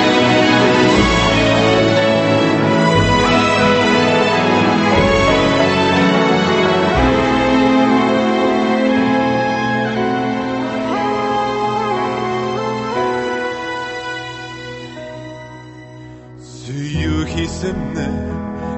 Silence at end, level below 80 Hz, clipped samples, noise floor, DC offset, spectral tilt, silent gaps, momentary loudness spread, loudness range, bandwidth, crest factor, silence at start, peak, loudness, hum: 0 s; -32 dBFS; under 0.1%; -35 dBFS; under 0.1%; -5.5 dB/octave; none; 13 LU; 12 LU; 8.6 kHz; 14 dB; 0 s; 0 dBFS; -15 LUFS; none